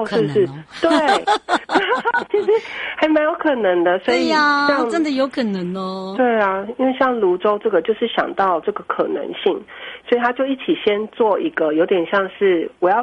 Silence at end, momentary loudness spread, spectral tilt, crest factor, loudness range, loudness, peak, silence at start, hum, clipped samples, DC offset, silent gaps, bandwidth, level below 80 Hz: 0 s; 6 LU; -5.5 dB/octave; 14 dB; 3 LU; -18 LUFS; -4 dBFS; 0 s; none; under 0.1%; under 0.1%; none; 11 kHz; -60 dBFS